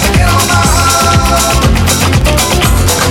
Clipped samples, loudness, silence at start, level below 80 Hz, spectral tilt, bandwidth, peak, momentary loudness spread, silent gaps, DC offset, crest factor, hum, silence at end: under 0.1%; -8 LUFS; 0 s; -14 dBFS; -4 dB/octave; 19 kHz; 0 dBFS; 1 LU; none; under 0.1%; 8 dB; none; 0 s